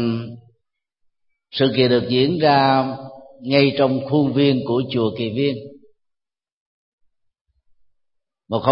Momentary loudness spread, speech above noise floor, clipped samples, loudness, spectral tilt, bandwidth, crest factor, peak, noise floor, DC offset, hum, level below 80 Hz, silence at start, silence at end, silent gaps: 15 LU; 66 dB; under 0.1%; -18 LUFS; -11.5 dB/octave; 5.6 kHz; 20 dB; 0 dBFS; -84 dBFS; under 0.1%; none; -60 dBFS; 0 s; 0 s; 6.52-6.98 s, 7.41-7.45 s